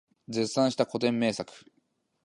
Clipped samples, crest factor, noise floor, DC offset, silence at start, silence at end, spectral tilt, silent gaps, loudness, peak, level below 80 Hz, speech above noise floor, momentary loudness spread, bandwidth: under 0.1%; 20 dB; -73 dBFS; under 0.1%; 0.3 s; 0.65 s; -5 dB/octave; none; -28 LUFS; -10 dBFS; -72 dBFS; 45 dB; 10 LU; 11.5 kHz